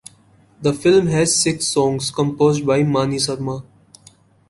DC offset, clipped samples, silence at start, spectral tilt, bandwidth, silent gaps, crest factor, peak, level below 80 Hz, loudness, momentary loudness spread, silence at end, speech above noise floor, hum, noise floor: under 0.1%; under 0.1%; 0.6 s; -4.5 dB/octave; 11.5 kHz; none; 16 dB; -4 dBFS; -52 dBFS; -18 LUFS; 8 LU; 0.9 s; 35 dB; none; -52 dBFS